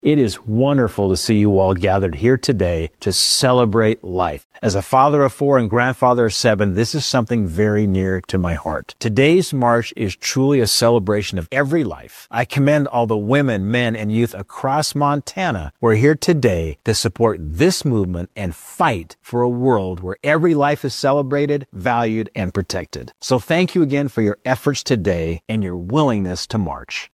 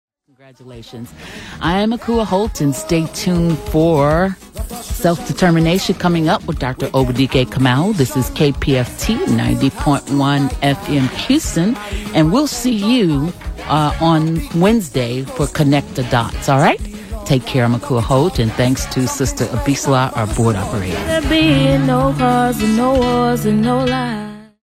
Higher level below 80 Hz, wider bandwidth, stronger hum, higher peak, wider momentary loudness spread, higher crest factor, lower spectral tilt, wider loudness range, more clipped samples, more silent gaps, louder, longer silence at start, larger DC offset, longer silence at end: second, -44 dBFS vs -30 dBFS; about the same, 15 kHz vs 16 kHz; neither; about the same, 0 dBFS vs -2 dBFS; about the same, 9 LU vs 7 LU; about the same, 16 dB vs 14 dB; about the same, -5.5 dB/octave vs -5.5 dB/octave; about the same, 3 LU vs 2 LU; neither; first, 4.45-4.50 s vs none; about the same, -18 LUFS vs -16 LUFS; second, 0.05 s vs 0.6 s; neither; second, 0.05 s vs 0.2 s